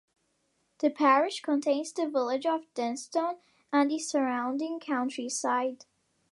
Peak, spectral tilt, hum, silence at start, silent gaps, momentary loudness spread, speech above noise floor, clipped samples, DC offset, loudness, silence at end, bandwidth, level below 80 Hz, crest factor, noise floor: -10 dBFS; -2.5 dB/octave; none; 0.8 s; none; 9 LU; 46 dB; under 0.1%; under 0.1%; -29 LUFS; 0.55 s; 11.5 kHz; -86 dBFS; 20 dB; -74 dBFS